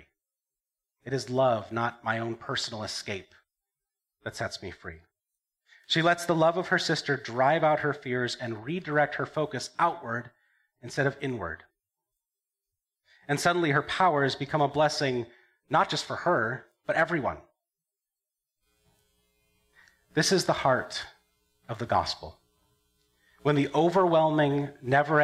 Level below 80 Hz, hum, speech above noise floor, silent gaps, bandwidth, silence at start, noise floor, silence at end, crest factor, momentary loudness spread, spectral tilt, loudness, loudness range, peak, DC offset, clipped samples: -64 dBFS; none; over 63 dB; none; 14.5 kHz; 1.05 s; under -90 dBFS; 0 s; 20 dB; 14 LU; -4.5 dB/octave; -27 LUFS; 8 LU; -10 dBFS; under 0.1%; under 0.1%